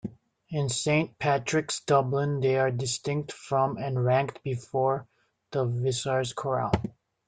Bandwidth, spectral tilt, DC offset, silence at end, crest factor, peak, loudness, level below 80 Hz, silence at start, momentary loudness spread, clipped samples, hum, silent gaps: 9.6 kHz; -5 dB/octave; under 0.1%; 0.4 s; 18 dB; -8 dBFS; -28 LUFS; -56 dBFS; 0.05 s; 7 LU; under 0.1%; none; none